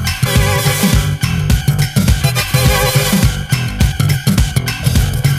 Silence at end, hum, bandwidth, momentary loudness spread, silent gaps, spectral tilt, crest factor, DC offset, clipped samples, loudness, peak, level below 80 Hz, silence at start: 0 s; none; 16 kHz; 4 LU; none; -4.5 dB/octave; 12 dB; under 0.1%; under 0.1%; -13 LUFS; 0 dBFS; -20 dBFS; 0 s